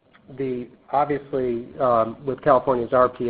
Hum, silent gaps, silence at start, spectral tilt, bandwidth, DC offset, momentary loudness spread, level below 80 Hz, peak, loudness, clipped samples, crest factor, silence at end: none; none; 0.3 s; -11.5 dB/octave; 4.7 kHz; under 0.1%; 10 LU; -54 dBFS; -4 dBFS; -23 LUFS; under 0.1%; 20 dB; 0 s